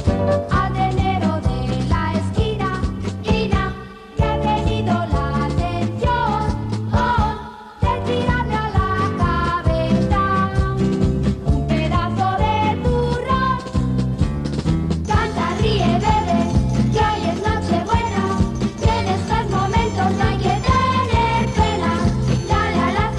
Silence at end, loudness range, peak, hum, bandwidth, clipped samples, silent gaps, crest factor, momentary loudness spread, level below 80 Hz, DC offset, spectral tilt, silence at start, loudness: 0 s; 3 LU; -4 dBFS; none; 11.5 kHz; under 0.1%; none; 14 dB; 4 LU; -26 dBFS; under 0.1%; -6.5 dB/octave; 0 s; -19 LUFS